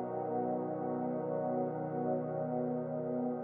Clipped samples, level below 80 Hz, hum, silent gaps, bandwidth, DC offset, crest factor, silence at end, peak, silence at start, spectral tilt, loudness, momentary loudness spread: under 0.1%; -78 dBFS; none; none; 2.9 kHz; under 0.1%; 12 dB; 0 s; -24 dBFS; 0 s; -11 dB/octave; -36 LUFS; 1 LU